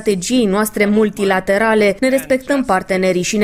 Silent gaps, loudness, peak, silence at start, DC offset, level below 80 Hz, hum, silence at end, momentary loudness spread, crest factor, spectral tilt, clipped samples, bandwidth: none; -15 LUFS; -2 dBFS; 0 s; under 0.1%; -44 dBFS; none; 0 s; 3 LU; 12 dB; -4.5 dB/octave; under 0.1%; 16 kHz